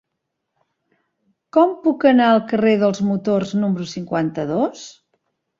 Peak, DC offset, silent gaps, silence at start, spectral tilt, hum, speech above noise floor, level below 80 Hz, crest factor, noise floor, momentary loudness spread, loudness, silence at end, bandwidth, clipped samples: -2 dBFS; under 0.1%; none; 1.55 s; -6.5 dB/octave; none; 60 dB; -62 dBFS; 18 dB; -77 dBFS; 10 LU; -18 LUFS; 0.7 s; 7.6 kHz; under 0.1%